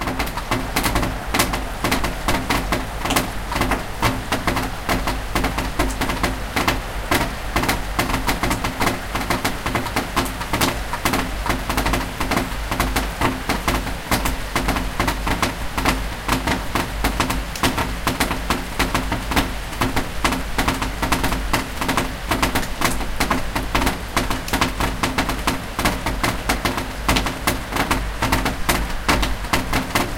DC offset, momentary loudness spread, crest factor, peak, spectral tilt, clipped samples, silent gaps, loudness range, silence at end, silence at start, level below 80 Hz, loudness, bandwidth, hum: under 0.1%; 3 LU; 22 dB; 0 dBFS; -4 dB/octave; under 0.1%; none; 1 LU; 0 s; 0 s; -28 dBFS; -22 LUFS; 17 kHz; none